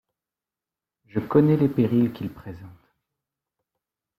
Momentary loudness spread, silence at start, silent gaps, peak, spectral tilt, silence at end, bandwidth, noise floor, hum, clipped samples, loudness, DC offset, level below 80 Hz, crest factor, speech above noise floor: 21 LU; 1.15 s; none; -6 dBFS; -10.5 dB/octave; 1.5 s; 14.5 kHz; -90 dBFS; none; under 0.1%; -22 LUFS; under 0.1%; -60 dBFS; 20 dB; 68 dB